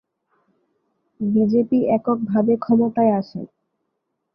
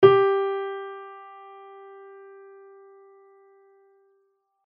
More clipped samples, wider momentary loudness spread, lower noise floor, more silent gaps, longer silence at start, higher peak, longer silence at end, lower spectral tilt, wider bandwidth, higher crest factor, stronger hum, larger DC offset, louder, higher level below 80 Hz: neither; second, 12 LU vs 27 LU; first, -76 dBFS vs -70 dBFS; neither; first, 1.2 s vs 0 s; about the same, -6 dBFS vs -4 dBFS; second, 0.9 s vs 3.45 s; first, -11 dB/octave vs -4.5 dB/octave; about the same, 5.6 kHz vs 5.2 kHz; second, 16 dB vs 24 dB; neither; neither; first, -19 LUFS vs -23 LUFS; first, -62 dBFS vs -74 dBFS